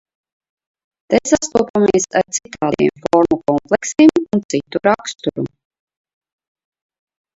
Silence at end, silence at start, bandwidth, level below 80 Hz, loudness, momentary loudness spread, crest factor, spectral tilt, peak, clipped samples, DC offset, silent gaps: 1.9 s; 1.1 s; 8 kHz; -52 dBFS; -16 LUFS; 10 LU; 18 dB; -4.5 dB/octave; 0 dBFS; under 0.1%; under 0.1%; 1.70-1.74 s, 4.45-4.49 s